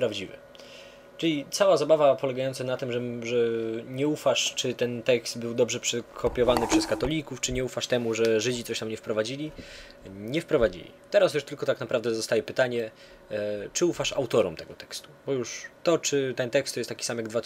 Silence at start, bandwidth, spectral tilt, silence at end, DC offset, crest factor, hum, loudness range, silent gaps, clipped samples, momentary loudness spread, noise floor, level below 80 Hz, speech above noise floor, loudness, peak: 0 s; 16 kHz; -4 dB/octave; 0.05 s; under 0.1%; 22 dB; none; 3 LU; none; under 0.1%; 15 LU; -48 dBFS; -52 dBFS; 21 dB; -27 LUFS; -6 dBFS